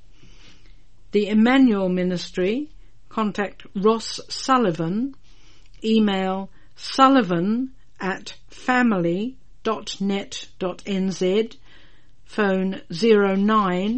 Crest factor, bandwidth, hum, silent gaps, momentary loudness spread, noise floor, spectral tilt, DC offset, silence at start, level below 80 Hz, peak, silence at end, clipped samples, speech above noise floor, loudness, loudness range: 20 dB; 8.8 kHz; none; none; 14 LU; -54 dBFS; -6 dB/octave; 1%; 1.15 s; -52 dBFS; -2 dBFS; 0 s; under 0.1%; 33 dB; -22 LUFS; 4 LU